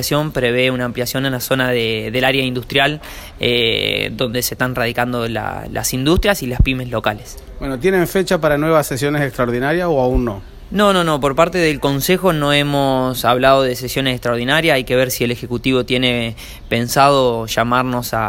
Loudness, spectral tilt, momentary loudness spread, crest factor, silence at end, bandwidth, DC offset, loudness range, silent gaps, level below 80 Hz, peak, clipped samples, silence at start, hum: -16 LUFS; -4.5 dB/octave; 7 LU; 16 dB; 0 s; 16.5 kHz; under 0.1%; 3 LU; none; -32 dBFS; 0 dBFS; under 0.1%; 0 s; none